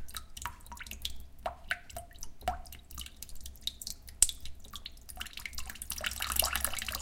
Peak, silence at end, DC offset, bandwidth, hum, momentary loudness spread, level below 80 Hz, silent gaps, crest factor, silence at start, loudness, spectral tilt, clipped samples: -2 dBFS; 0 s; under 0.1%; 17 kHz; none; 19 LU; -48 dBFS; none; 36 dB; 0 s; -36 LUFS; -0.5 dB/octave; under 0.1%